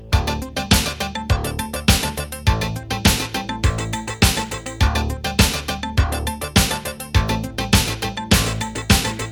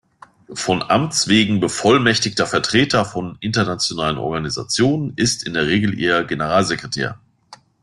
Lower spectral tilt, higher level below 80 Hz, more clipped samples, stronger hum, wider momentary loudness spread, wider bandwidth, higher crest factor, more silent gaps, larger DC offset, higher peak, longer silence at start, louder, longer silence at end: about the same, -4 dB/octave vs -4 dB/octave; first, -26 dBFS vs -50 dBFS; neither; neither; about the same, 7 LU vs 9 LU; first, 19.5 kHz vs 12.5 kHz; about the same, 20 dB vs 18 dB; neither; neither; about the same, 0 dBFS vs -2 dBFS; second, 0 s vs 0.5 s; about the same, -20 LUFS vs -18 LUFS; second, 0 s vs 0.25 s